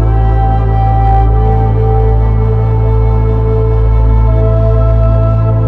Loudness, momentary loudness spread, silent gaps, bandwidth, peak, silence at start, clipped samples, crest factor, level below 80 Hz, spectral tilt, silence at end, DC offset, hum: -11 LUFS; 2 LU; none; 3.3 kHz; 0 dBFS; 0 s; under 0.1%; 8 dB; -12 dBFS; -11 dB/octave; 0 s; under 0.1%; none